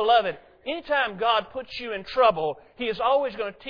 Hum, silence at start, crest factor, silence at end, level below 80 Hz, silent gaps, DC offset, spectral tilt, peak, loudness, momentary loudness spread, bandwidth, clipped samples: none; 0 s; 18 dB; 0 s; -56 dBFS; none; under 0.1%; -5.5 dB/octave; -8 dBFS; -25 LUFS; 12 LU; 5.4 kHz; under 0.1%